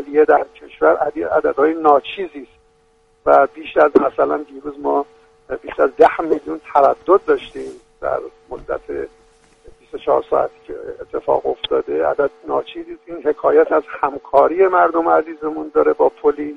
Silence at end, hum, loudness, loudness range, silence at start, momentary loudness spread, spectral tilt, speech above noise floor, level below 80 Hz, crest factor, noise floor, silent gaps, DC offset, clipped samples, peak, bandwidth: 0 s; none; -17 LUFS; 6 LU; 0 s; 17 LU; -6.5 dB/octave; 40 dB; -52 dBFS; 18 dB; -56 dBFS; none; under 0.1%; under 0.1%; 0 dBFS; 6.4 kHz